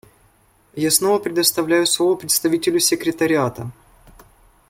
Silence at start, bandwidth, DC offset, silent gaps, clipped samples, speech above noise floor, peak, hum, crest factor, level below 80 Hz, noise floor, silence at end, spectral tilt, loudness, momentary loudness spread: 0.75 s; 16.5 kHz; under 0.1%; none; under 0.1%; 38 dB; 0 dBFS; none; 20 dB; -56 dBFS; -57 dBFS; 1 s; -3 dB/octave; -18 LUFS; 9 LU